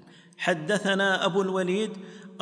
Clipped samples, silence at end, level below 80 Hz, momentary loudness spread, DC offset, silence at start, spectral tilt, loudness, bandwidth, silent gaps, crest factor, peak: under 0.1%; 0.05 s; -82 dBFS; 11 LU; under 0.1%; 0.05 s; -4.5 dB/octave; -26 LUFS; 10.5 kHz; none; 16 dB; -10 dBFS